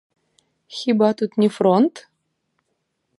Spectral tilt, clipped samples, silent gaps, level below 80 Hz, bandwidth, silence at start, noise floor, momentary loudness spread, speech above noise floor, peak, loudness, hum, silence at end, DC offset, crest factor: -7 dB/octave; under 0.1%; none; -70 dBFS; 11.5 kHz; 0.7 s; -73 dBFS; 8 LU; 55 dB; -4 dBFS; -19 LUFS; none; 1.2 s; under 0.1%; 18 dB